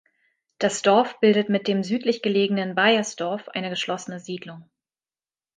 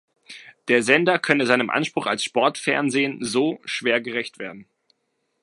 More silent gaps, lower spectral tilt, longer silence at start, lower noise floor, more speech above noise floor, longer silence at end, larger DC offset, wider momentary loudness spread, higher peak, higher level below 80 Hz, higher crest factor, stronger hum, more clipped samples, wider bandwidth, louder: neither; about the same, -4.5 dB/octave vs -4 dB/octave; first, 0.6 s vs 0.3 s; first, under -90 dBFS vs -73 dBFS; first, over 67 dB vs 52 dB; first, 0.95 s vs 0.8 s; neither; second, 14 LU vs 17 LU; about the same, -4 dBFS vs -2 dBFS; about the same, -72 dBFS vs -70 dBFS; about the same, 20 dB vs 22 dB; neither; neither; second, 9.6 kHz vs 11.5 kHz; about the same, -22 LUFS vs -21 LUFS